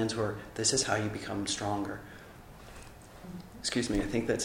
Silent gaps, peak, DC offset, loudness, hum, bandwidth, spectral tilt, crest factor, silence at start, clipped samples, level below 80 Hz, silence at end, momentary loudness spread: none; -14 dBFS; under 0.1%; -32 LUFS; none; 16 kHz; -3.5 dB/octave; 20 dB; 0 s; under 0.1%; -50 dBFS; 0 s; 22 LU